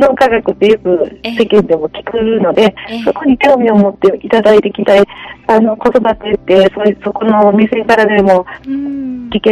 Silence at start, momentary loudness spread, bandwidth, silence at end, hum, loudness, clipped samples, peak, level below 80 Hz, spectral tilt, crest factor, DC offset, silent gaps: 0 s; 9 LU; 12 kHz; 0 s; none; -11 LUFS; 0.4%; 0 dBFS; -42 dBFS; -6.5 dB/octave; 10 dB; under 0.1%; none